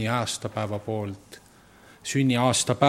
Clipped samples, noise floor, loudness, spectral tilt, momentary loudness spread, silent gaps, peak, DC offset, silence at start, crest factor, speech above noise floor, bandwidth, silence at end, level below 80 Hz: under 0.1%; -53 dBFS; -26 LUFS; -4.5 dB/octave; 15 LU; none; -4 dBFS; under 0.1%; 0 s; 22 dB; 28 dB; 16 kHz; 0 s; -62 dBFS